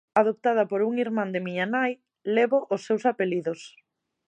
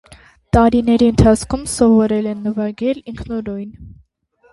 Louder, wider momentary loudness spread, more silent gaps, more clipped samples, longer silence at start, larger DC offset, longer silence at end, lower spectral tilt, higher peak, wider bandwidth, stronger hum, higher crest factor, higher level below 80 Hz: second, -26 LUFS vs -16 LUFS; second, 7 LU vs 14 LU; neither; neither; second, 0.15 s vs 0.55 s; neither; about the same, 0.6 s vs 0.65 s; about the same, -6.5 dB/octave vs -6.5 dB/octave; second, -6 dBFS vs 0 dBFS; second, 9.4 kHz vs 11.5 kHz; neither; about the same, 20 dB vs 16 dB; second, -80 dBFS vs -32 dBFS